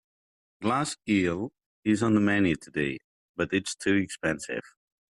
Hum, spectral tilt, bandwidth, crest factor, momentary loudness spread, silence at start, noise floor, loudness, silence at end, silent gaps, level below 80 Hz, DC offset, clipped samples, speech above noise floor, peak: none; -5 dB/octave; 12 kHz; 16 dB; 12 LU; 0.6 s; under -90 dBFS; -28 LUFS; 0.5 s; 1.66-1.83 s, 3.04-3.34 s; -62 dBFS; under 0.1%; under 0.1%; over 63 dB; -12 dBFS